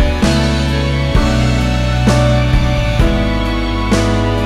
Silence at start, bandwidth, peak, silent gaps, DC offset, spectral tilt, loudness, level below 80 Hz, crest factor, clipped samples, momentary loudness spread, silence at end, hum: 0 s; 13.5 kHz; 0 dBFS; none; under 0.1%; -6 dB/octave; -14 LUFS; -18 dBFS; 12 dB; under 0.1%; 4 LU; 0 s; none